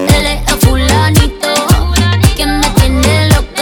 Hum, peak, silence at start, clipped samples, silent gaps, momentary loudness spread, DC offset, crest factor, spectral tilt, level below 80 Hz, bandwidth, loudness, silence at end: none; 0 dBFS; 0 s; under 0.1%; none; 3 LU; under 0.1%; 10 dB; -4.5 dB/octave; -16 dBFS; over 20 kHz; -10 LUFS; 0 s